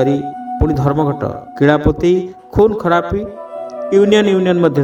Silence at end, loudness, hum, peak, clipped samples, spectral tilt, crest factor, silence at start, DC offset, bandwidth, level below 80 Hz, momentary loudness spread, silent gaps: 0 s; -14 LUFS; none; 0 dBFS; under 0.1%; -7.5 dB/octave; 14 dB; 0 s; under 0.1%; 8.6 kHz; -32 dBFS; 13 LU; none